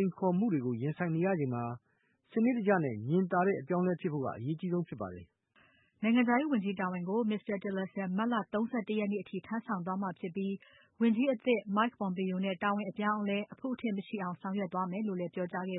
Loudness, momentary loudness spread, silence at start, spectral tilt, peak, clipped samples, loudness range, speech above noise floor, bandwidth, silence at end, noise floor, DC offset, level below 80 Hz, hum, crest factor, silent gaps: -33 LUFS; 9 LU; 0 s; -11 dB/octave; -16 dBFS; under 0.1%; 3 LU; 35 dB; 4 kHz; 0 s; -68 dBFS; under 0.1%; -76 dBFS; none; 18 dB; none